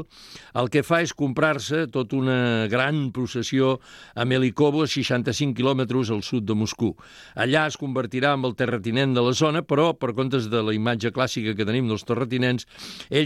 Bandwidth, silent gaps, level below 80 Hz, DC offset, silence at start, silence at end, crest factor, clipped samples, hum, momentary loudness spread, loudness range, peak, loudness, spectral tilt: 13.5 kHz; none; -60 dBFS; under 0.1%; 0 s; 0 s; 16 dB; under 0.1%; none; 7 LU; 2 LU; -6 dBFS; -23 LUFS; -5.5 dB/octave